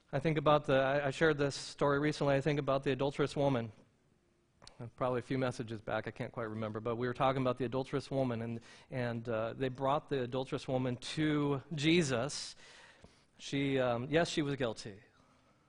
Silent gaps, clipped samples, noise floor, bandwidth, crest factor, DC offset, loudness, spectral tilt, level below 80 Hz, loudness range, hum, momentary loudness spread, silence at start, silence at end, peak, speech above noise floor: none; under 0.1%; -72 dBFS; 10.5 kHz; 20 dB; under 0.1%; -34 LUFS; -6 dB/octave; -62 dBFS; 5 LU; none; 11 LU; 0.1 s; 0.7 s; -14 dBFS; 38 dB